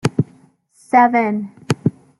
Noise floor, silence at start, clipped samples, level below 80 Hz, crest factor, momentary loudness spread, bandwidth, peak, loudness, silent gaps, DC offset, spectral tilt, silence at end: -52 dBFS; 0.05 s; under 0.1%; -56 dBFS; 18 dB; 12 LU; 12 kHz; 0 dBFS; -18 LUFS; none; under 0.1%; -6.5 dB/octave; 0.3 s